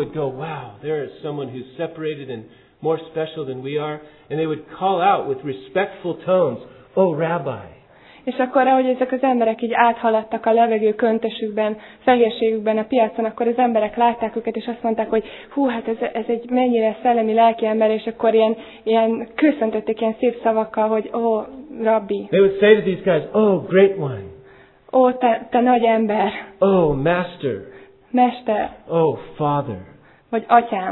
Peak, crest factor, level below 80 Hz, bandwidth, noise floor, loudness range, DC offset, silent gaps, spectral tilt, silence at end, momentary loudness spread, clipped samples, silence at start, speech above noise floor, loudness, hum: 0 dBFS; 20 dB; -54 dBFS; 4.2 kHz; -48 dBFS; 5 LU; under 0.1%; none; -10.5 dB/octave; 0 s; 12 LU; under 0.1%; 0 s; 29 dB; -19 LUFS; none